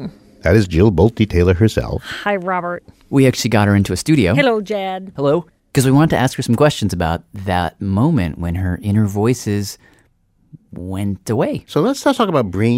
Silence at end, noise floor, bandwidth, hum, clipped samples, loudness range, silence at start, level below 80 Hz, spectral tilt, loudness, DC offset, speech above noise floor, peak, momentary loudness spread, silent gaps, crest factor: 0 s; -58 dBFS; 16 kHz; none; under 0.1%; 5 LU; 0 s; -36 dBFS; -6.5 dB/octave; -16 LUFS; under 0.1%; 42 dB; -2 dBFS; 10 LU; none; 14 dB